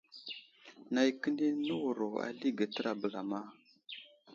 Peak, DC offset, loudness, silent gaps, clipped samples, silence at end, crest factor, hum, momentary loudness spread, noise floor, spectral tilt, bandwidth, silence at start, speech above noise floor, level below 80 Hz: -18 dBFS; under 0.1%; -36 LUFS; none; under 0.1%; 0 s; 20 dB; none; 17 LU; -58 dBFS; -5 dB/octave; 7.6 kHz; 0.15 s; 23 dB; -84 dBFS